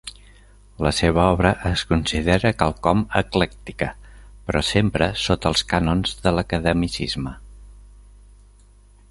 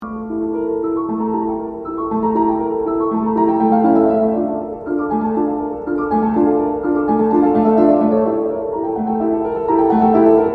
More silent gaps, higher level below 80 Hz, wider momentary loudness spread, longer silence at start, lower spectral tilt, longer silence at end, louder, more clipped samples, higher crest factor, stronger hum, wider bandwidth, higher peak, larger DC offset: neither; first, -34 dBFS vs -46 dBFS; about the same, 10 LU vs 9 LU; about the same, 0.05 s vs 0 s; second, -5.5 dB/octave vs -11 dB/octave; first, 1.3 s vs 0 s; second, -21 LUFS vs -17 LUFS; neither; first, 22 dB vs 16 dB; first, 50 Hz at -40 dBFS vs none; first, 11.5 kHz vs 4.3 kHz; about the same, 0 dBFS vs 0 dBFS; neither